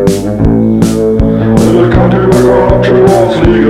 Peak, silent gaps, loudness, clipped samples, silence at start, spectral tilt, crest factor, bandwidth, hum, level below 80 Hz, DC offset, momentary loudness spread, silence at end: 0 dBFS; none; -7 LUFS; 0.2%; 0 s; -7.5 dB/octave; 6 dB; 15.5 kHz; none; -20 dBFS; under 0.1%; 3 LU; 0 s